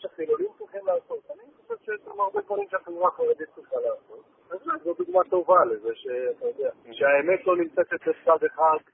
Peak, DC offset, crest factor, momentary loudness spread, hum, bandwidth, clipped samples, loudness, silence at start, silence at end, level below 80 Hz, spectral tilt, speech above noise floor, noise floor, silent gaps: -6 dBFS; under 0.1%; 20 dB; 15 LU; none; 3.7 kHz; under 0.1%; -25 LUFS; 0 s; 0.15 s; -74 dBFS; -9 dB/octave; 21 dB; -45 dBFS; none